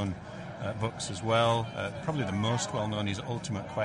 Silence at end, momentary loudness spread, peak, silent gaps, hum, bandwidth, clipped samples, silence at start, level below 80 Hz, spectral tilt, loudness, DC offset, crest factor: 0 s; 10 LU; -14 dBFS; none; none; 11 kHz; under 0.1%; 0 s; -58 dBFS; -5 dB/octave; -31 LUFS; under 0.1%; 18 dB